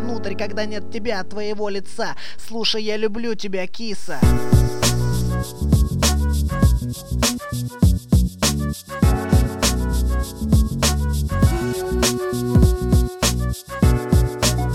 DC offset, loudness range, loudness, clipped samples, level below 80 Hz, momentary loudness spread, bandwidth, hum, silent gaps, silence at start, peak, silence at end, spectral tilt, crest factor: under 0.1%; 6 LU; -20 LUFS; under 0.1%; -24 dBFS; 10 LU; 16.5 kHz; none; none; 0 s; -2 dBFS; 0 s; -5 dB/octave; 16 dB